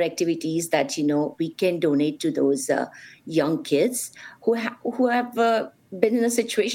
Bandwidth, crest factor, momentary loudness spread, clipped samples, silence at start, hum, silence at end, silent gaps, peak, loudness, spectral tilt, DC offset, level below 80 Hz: 17 kHz; 20 dB; 7 LU; under 0.1%; 0 s; none; 0 s; none; -4 dBFS; -24 LUFS; -4.5 dB/octave; under 0.1%; -74 dBFS